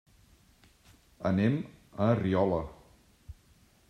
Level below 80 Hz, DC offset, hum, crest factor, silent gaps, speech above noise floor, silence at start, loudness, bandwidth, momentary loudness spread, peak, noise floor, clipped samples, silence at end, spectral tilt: -58 dBFS; under 0.1%; none; 20 dB; none; 35 dB; 1.2 s; -30 LUFS; 10 kHz; 11 LU; -12 dBFS; -63 dBFS; under 0.1%; 0.55 s; -9 dB/octave